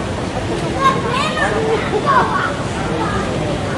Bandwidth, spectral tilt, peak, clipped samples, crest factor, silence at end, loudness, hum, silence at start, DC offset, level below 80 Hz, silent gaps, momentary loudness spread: 11.5 kHz; -5 dB/octave; 0 dBFS; under 0.1%; 16 dB; 0 s; -17 LUFS; none; 0 s; under 0.1%; -34 dBFS; none; 7 LU